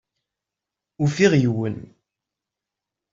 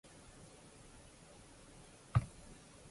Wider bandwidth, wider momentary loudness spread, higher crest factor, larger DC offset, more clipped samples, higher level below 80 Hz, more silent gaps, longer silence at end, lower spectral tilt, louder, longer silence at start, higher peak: second, 7.8 kHz vs 11.5 kHz; second, 12 LU vs 20 LU; second, 20 dB vs 26 dB; neither; neither; about the same, -58 dBFS vs -56 dBFS; neither; first, 1.25 s vs 0 s; about the same, -6.5 dB/octave vs -6 dB/octave; first, -20 LUFS vs -39 LUFS; first, 1 s vs 0.05 s; first, -4 dBFS vs -18 dBFS